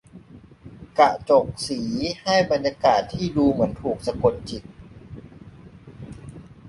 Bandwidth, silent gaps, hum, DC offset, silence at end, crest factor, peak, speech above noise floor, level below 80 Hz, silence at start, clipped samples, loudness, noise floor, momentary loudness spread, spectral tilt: 11.5 kHz; none; none; under 0.1%; 0 s; 22 dB; -2 dBFS; 25 dB; -48 dBFS; 0.15 s; under 0.1%; -22 LUFS; -46 dBFS; 23 LU; -5.5 dB/octave